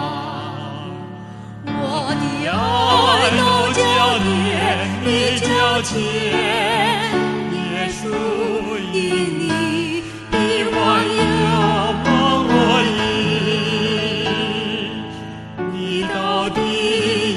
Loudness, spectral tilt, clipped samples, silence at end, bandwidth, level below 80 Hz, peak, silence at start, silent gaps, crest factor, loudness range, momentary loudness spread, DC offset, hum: -18 LUFS; -4.5 dB/octave; under 0.1%; 0 s; 12 kHz; -44 dBFS; -2 dBFS; 0 s; none; 16 dB; 5 LU; 13 LU; under 0.1%; none